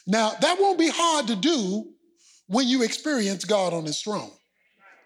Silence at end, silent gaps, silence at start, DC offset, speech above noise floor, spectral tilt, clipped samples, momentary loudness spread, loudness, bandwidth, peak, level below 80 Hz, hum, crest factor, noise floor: 0.75 s; none; 0.05 s; under 0.1%; 36 dB; -3.5 dB/octave; under 0.1%; 9 LU; -24 LUFS; 14.5 kHz; -8 dBFS; -80 dBFS; none; 16 dB; -60 dBFS